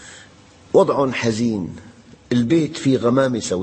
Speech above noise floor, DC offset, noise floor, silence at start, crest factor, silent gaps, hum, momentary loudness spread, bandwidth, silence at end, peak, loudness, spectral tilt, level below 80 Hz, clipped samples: 29 dB; under 0.1%; -47 dBFS; 0 s; 18 dB; none; none; 8 LU; 8.8 kHz; 0 s; -2 dBFS; -19 LUFS; -6 dB/octave; -54 dBFS; under 0.1%